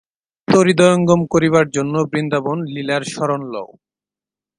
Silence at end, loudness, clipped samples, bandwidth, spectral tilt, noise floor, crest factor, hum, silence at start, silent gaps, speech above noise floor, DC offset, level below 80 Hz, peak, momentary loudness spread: 0.9 s; -16 LUFS; under 0.1%; 10.5 kHz; -6 dB/octave; -90 dBFS; 18 dB; none; 0.5 s; none; 74 dB; under 0.1%; -54 dBFS; 0 dBFS; 14 LU